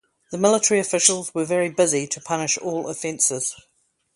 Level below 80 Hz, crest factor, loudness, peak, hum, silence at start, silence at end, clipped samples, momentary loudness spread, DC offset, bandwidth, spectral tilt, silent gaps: -68 dBFS; 20 dB; -21 LUFS; -2 dBFS; none; 0.3 s; 0.55 s; under 0.1%; 10 LU; under 0.1%; 11.5 kHz; -2.5 dB/octave; none